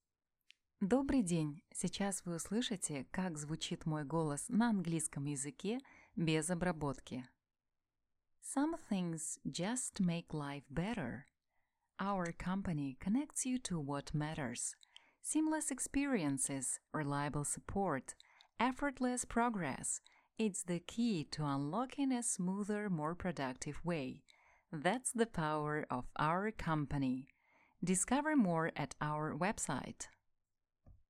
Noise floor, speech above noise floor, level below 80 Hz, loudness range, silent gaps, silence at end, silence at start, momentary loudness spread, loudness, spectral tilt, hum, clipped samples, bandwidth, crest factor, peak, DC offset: -89 dBFS; 51 dB; -62 dBFS; 4 LU; none; 0.15 s; 0.8 s; 8 LU; -39 LUFS; -4.5 dB/octave; none; under 0.1%; 15.5 kHz; 20 dB; -18 dBFS; under 0.1%